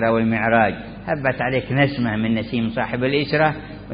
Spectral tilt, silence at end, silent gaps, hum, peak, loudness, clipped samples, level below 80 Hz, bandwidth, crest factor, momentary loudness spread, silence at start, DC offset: -11.5 dB/octave; 0 s; none; none; -2 dBFS; -20 LUFS; under 0.1%; -44 dBFS; 5.2 kHz; 18 dB; 6 LU; 0 s; under 0.1%